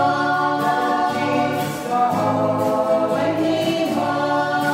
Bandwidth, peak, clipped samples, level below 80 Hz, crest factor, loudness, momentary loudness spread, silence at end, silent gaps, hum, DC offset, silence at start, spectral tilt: 16 kHz; -6 dBFS; under 0.1%; -58 dBFS; 12 dB; -20 LUFS; 2 LU; 0 s; none; none; under 0.1%; 0 s; -5.5 dB/octave